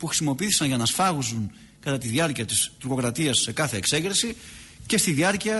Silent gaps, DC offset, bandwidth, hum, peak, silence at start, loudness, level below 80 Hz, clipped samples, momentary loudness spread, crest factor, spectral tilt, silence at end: none; under 0.1%; 12 kHz; none; -10 dBFS; 0 s; -23 LUFS; -54 dBFS; under 0.1%; 10 LU; 16 dB; -3 dB/octave; 0 s